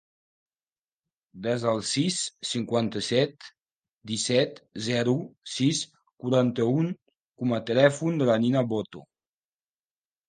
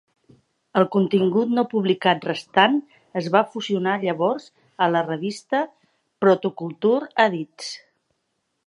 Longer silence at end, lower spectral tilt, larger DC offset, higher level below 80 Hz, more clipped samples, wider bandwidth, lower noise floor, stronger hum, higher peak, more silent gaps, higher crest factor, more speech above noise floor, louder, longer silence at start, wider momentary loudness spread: first, 1.3 s vs 0.9 s; about the same, -5 dB/octave vs -6 dB/octave; neither; first, -68 dBFS vs -74 dBFS; neither; second, 9.8 kHz vs 11 kHz; first, under -90 dBFS vs -75 dBFS; neither; second, -6 dBFS vs -2 dBFS; first, 3.92-4.01 s, 6.13-6.17 s, 7.02-7.06 s, 7.25-7.29 s vs none; about the same, 22 dB vs 22 dB; first, over 64 dB vs 54 dB; second, -26 LUFS vs -22 LUFS; first, 1.35 s vs 0.75 s; about the same, 11 LU vs 11 LU